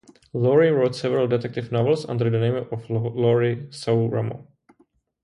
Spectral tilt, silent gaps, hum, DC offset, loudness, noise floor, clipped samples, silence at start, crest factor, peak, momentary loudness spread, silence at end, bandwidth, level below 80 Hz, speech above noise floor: -8 dB/octave; none; none; under 0.1%; -22 LUFS; -63 dBFS; under 0.1%; 0.35 s; 16 dB; -6 dBFS; 10 LU; 0.8 s; 11 kHz; -60 dBFS; 42 dB